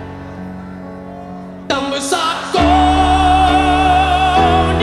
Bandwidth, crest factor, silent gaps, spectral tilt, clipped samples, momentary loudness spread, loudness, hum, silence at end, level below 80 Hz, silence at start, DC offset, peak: 13 kHz; 12 dB; none; -5 dB/octave; under 0.1%; 19 LU; -13 LUFS; none; 0 s; -24 dBFS; 0 s; under 0.1%; -2 dBFS